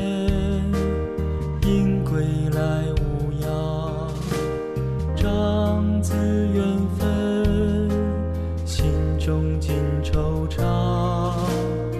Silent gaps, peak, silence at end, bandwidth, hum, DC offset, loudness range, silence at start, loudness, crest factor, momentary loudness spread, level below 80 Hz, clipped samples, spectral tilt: none; -8 dBFS; 0 s; 14 kHz; none; under 0.1%; 2 LU; 0 s; -23 LUFS; 14 dB; 5 LU; -30 dBFS; under 0.1%; -7.5 dB/octave